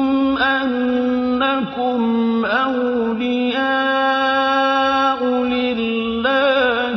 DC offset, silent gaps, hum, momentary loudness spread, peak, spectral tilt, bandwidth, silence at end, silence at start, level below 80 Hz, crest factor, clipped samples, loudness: under 0.1%; none; none; 4 LU; -4 dBFS; -5.5 dB/octave; 6.2 kHz; 0 s; 0 s; -50 dBFS; 12 dB; under 0.1%; -17 LUFS